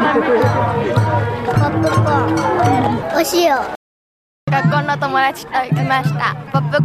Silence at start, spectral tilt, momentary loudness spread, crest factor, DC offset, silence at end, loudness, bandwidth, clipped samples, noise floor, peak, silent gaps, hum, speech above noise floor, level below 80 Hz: 0 s; -6 dB/octave; 5 LU; 12 dB; under 0.1%; 0 s; -16 LUFS; 15.5 kHz; under 0.1%; under -90 dBFS; -2 dBFS; 3.76-4.47 s; none; over 75 dB; -44 dBFS